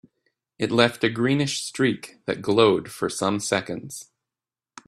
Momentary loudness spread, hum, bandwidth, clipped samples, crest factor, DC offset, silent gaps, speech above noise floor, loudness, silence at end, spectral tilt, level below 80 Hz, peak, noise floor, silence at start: 13 LU; none; 14.5 kHz; under 0.1%; 24 dB; under 0.1%; none; over 67 dB; -23 LUFS; 0.85 s; -4.5 dB/octave; -64 dBFS; 0 dBFS; under -90 dBFS; 0.6 s